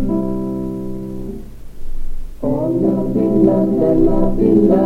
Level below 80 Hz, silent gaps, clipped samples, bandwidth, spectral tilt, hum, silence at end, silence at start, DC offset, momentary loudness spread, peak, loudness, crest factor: -26 dBFS; none; under 0.1%; 4.1 kHz; -10.5 dB/octave; none; 0 s; 0 s; under 0.1%; 19 LU; 0 dBFS; -16 LUFS; 14 dB